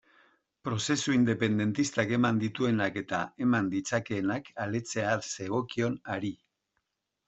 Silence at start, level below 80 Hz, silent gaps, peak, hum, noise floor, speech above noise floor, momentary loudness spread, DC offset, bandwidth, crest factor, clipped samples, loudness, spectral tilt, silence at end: 0.65 s; -66 dBFS; none; -10 dBFS; none; -81 dBFS; 52 dB; 8 LU; under 0.1%; 8.2 kHz; 20 dB; under 0.1%; -30 LUFS; -5 dB/octave; 0.9 s